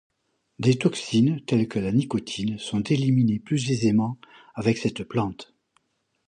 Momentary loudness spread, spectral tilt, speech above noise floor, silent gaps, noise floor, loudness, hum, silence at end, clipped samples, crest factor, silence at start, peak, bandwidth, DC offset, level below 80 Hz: 8 LU; -6.5 dB/octave; 46 dB; none; -69 dBFS; -24 LUFS; none; 0.85 s; under 0.1%; 18 dB; 0.6 s; -6 dBFS; 10.5 kHz; under 0.1%; -58 dBFS